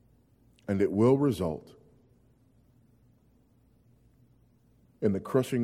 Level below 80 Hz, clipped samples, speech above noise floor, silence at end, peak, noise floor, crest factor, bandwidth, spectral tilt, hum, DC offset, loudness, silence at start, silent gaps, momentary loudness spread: -62 dBFS; under 0.1%; 38 dB; 0 s; -12 dBFS; -64 dBFS; 20 dB; 15.5 kHz; -8 dB/octave; none; under 0.1%; -28 LUFS; 0.7 s; none; 12 LU